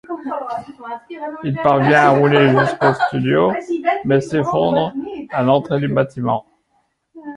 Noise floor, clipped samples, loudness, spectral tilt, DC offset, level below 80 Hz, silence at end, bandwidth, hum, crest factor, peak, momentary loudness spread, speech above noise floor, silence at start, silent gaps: -65 dBFS; under 0.1%; -16 LUFS; -7.5 dB/octave; under 0.1%; -54 dBFS; 0 s; 11 kHz; none; 16 dB; -2 dBFS; 16 LU; 48 dB; 0.1 s; none